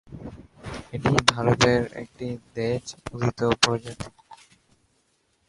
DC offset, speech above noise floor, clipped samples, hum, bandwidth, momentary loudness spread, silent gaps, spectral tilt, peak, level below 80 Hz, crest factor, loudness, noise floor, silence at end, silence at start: under 0.1%; 44 dB; under 0.1%; none; 11.5 kHz; 20 LU; none; -4.5 dB/octave; 0 dBFS; -48 dBFS; 26 dB; -24 LUFS; -68 dBFS; 1.15 s; 0.1 s